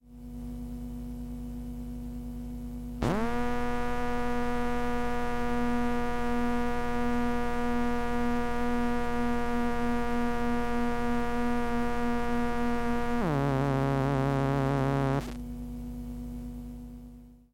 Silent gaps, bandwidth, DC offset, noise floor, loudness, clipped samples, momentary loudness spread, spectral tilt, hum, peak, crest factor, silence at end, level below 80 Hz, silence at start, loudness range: none; 16 kHz; under 0.1%; -49 dBFS; -31 LUFS; under 0.1%; 12 LU; -7 dB/octave; none; -12 dBFS; 16 dB; 0.15 s; -40 dBFS; 0.05 s; 5 LU